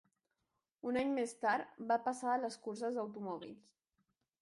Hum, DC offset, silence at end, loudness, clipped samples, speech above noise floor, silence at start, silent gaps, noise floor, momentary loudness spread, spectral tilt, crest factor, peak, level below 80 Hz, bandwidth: none; under 0.1%; 0.8 s; -39 LUFS; under 0.1%; 49 dB; 0.85 s; none; -87 dBFS; 10 LU; -4.5 dB/octave; 18 dB; -22 dBFS; -80 dBFS; 11.5 kHz